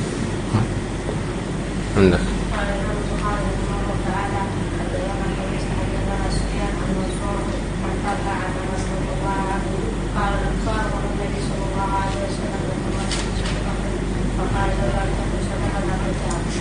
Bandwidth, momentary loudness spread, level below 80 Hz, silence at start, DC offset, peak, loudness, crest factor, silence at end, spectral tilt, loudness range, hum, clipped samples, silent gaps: 10 kHz; 3 LU; -28 dBFS; 0 s; under 0.1%; -2 dBFS; -23 LUFS; 20 dB; 0 s; -6 dB/octave; 2 LU; none; under 0.1%; none